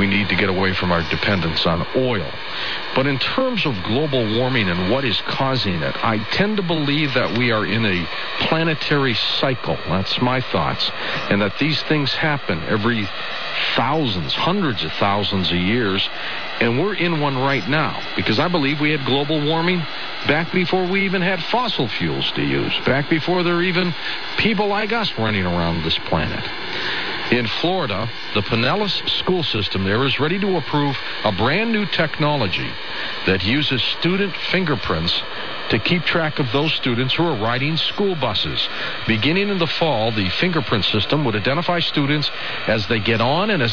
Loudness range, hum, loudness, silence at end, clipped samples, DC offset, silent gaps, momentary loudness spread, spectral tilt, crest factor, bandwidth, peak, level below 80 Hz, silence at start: 1 LU; none; -19 LUFS; 0 s; under 0.1%; 3%; none; 4 LU; -6.5 dB/octave; 16 dB; 5.4 kHz; -4 dBFS; -46 dBFS; 0 s